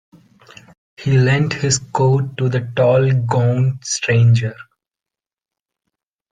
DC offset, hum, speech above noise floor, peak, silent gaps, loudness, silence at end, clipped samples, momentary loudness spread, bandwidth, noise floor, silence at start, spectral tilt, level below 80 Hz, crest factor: under 0.1%; none; 73 dB; -4 dBFS; none; -16 LUFS; 1.7 s; under 0.1%; 6 LU; 9.4 kHz; -88 dBFS; 1 s; -5.5 dB/octave; -52 dBFS; 14 dB